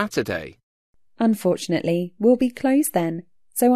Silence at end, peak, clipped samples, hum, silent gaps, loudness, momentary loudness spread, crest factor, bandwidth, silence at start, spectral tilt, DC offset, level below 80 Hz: 0 s; -6 dBFS; under 0.1%; none; 0.63-0.93 s; -22 LUFS; 11 LU; 16 dB; 14 kHz; 0 s; -5.5 dB/octave; 0.2%; -58 dBFS